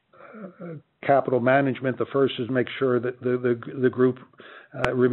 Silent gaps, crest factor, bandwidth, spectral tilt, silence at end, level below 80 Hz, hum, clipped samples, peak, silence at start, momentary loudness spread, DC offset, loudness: none; 24 dB; 4.5 kHz; -5.5 dB/octave; 0 s; -60 dBFS; none; under 0.1%; 0 dBFS; 0.2 s; 19 LU; under 0.1%; -24 LUFS